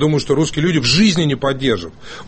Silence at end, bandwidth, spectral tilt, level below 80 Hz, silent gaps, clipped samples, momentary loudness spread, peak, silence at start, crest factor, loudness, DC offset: 0 s; 8.8 kHz; -5 dB/octave; -40 dBFS; none; under 0.1%; 8 LU; -2 dBFS; 0 s; 14 dB; -15 LUFS; under 0.1%